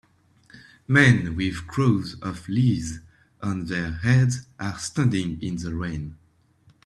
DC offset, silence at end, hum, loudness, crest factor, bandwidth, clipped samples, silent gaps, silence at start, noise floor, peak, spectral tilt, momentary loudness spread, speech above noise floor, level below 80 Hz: under 0.1%; 0.7 s; none; -24 LUFS; 22 dB; 11 kHz; under 0.1%; none; 0.55 s; -59 dBFS; -2 dBFS; -6 dB/octave; 15 LU; 36 dB; -48 dBFS